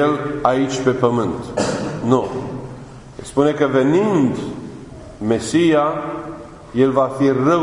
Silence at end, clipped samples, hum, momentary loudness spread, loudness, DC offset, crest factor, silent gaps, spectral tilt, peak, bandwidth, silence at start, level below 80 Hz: 0 s; under 0.1%; none; 19 LU; -18 LUFS; under 0.1%; 18 dB; none; -6.5 dB/octave; 0 dBFS; 11 kHz; 0 s; -48 dBFS